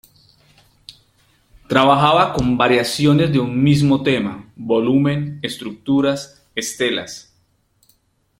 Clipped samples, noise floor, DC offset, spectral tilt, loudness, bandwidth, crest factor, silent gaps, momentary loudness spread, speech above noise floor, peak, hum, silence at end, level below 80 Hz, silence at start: under 0.1%; -62 dBFS; under 0.1%; -5.5 dB/octave; -17 LUFS; 16 kHz; 18 dB; none; 13 LU; 45 dB; 0 dBFS; none; 1.2 s; -48 dBFS; 0.9 s